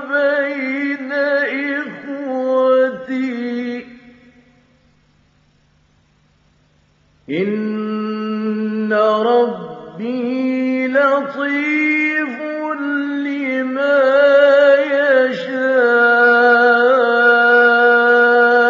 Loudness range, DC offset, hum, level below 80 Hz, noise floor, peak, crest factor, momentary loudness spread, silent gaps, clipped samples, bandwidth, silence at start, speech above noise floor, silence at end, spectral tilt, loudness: 14 LU; under 0.1%; none; -68 dBFS; -56 dBFS; -2 dBFS; 14 dB; 12 LU; none; under 0.1%; 7.2 kHz; 0 s; 38 dB; 0 s; -6 dB/octave; -15 LUFS